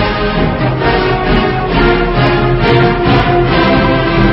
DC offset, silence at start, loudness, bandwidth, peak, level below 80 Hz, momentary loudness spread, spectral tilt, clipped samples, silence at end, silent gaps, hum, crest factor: under 0.1%; 0 s; -11 LUFS; 5.8 kHz; 0 dBFS; -20 dBFS; 3 LU; -9 dB/octave; 0.1%; 0 s; none; none; 10 dB